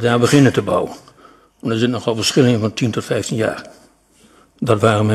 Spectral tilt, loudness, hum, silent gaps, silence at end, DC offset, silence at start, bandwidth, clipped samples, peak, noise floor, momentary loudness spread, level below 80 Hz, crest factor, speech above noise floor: -5.5 dB/octave; -17 LUFS; none; none; 0 s; under 0.1%; 0 s; 13 kHz; under 0.1%; 0 dBFS; -52 dBFS; 11 LU; -54 dBFS; 16 dB; 36 dB